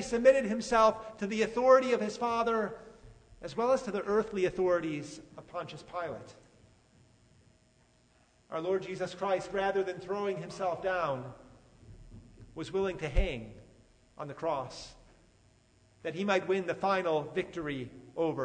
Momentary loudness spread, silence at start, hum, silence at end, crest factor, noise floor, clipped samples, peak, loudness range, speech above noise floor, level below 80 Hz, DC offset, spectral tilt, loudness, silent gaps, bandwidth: 18 LU; 0 s; none; 0 s; 22 dB; -66 dBFS; under 0.1%; -10 dBFS; 11 LU; 35 dB; -48 dBFS; under 0.1%; -5.5 dB/octave; -32 LUFS; none; 9.6 kHz